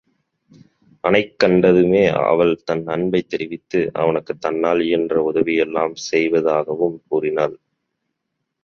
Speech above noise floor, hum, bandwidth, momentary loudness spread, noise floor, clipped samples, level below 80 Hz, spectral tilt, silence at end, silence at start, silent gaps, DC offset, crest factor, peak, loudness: 59 dB; none; 7.2 kHz; 9 LU; -77 dBFS; under 0.1%; -54 dBFS; -6 dB/octave; 1.05 s; 1.05 s; none; under 0.1%; 18 dB; -2 dBFS; -18 LUFS